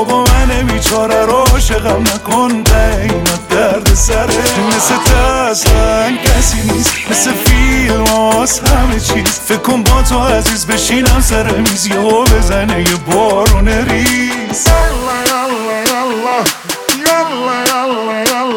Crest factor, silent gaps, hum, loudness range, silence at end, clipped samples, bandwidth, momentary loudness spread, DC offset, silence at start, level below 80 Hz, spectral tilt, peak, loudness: 10 dB; none; none; 2 LU; 0 s; under 0.1%; 19.5 kHz; 4 LU; under 0.1%; 0 s; -16 dBFS; -4 dB/octave; 0 dBFS; -11 LUFS